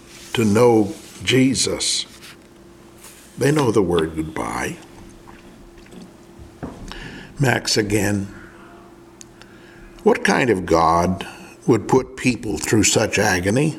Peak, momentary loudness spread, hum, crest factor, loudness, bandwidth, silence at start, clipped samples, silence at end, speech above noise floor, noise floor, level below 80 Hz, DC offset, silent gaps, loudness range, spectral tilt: 0 dBFS; 19 LU; none; 20 dB; -19 LUFS; 17 kHz; 0.1 s; under 0.1%; 0 s; 27 dB; -45 dBFS; -46 dBFS; under 0.1%; none; 7 LU; -4.5 dB/octave